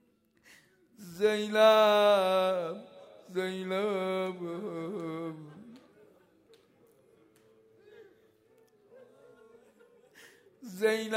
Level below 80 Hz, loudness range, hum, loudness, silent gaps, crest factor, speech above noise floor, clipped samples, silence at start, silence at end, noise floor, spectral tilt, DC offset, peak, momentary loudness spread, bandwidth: -84 dBFS; 17 LU; none; -29 LUFS; none; 22 dB; 38 dB; under 0.1%; 1 s; 0 s; -66 dBFS; -4.5 dB/octave; under 0.1%; -10 dBFS; 25 LU; 16 kHz